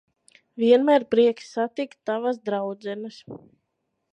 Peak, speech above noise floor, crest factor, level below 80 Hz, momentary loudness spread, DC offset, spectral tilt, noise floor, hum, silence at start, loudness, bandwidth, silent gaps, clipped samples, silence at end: -6 dBFS; 54 dB; 18 dB; -74 dBFS; 24 LU; under 0.1%; -6 dB/octave; -77 dBFS; none; 0.55 s; -23 LUFS; 9 kHz; none; under 0.1%; 0.75 s